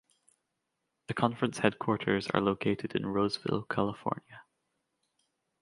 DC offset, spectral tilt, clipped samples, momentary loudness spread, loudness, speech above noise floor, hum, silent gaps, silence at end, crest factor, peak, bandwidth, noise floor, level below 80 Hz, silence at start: under 0.1%; -6 dB/octave; under 0.1%; 7 LU; -31 LUFS; 52 dB; none; none; 1.2 s; 24 dB; -10 dBFS; 11.5 kHz; -83 dBFS; -64 dBFS; 1.1 s